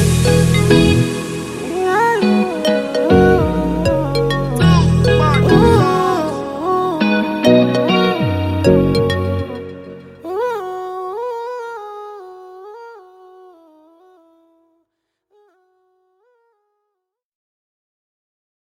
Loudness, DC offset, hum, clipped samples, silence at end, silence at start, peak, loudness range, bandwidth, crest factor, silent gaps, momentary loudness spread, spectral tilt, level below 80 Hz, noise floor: -15 LUFS; under 0.1%; none; under 0.1%; 5.7 s; 0 s; 0 dBFS; 15 LU; 15 kHz; 16 dB; none; 19 LU; -6.5 dB/octave; -34 dBFS; -77 dBFS